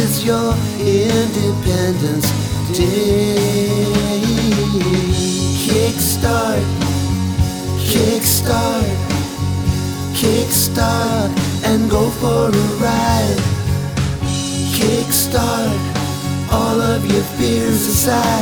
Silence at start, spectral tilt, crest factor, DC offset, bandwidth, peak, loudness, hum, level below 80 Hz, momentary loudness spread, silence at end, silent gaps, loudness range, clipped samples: 0 s; -5 dB/octave; 14 dB; under 0.1%; over 20 kHz; -2 dBFS; -16 LUFS; none; -30 dBFS; 5 LU; 0 s; none; 1 LU; under 0.1%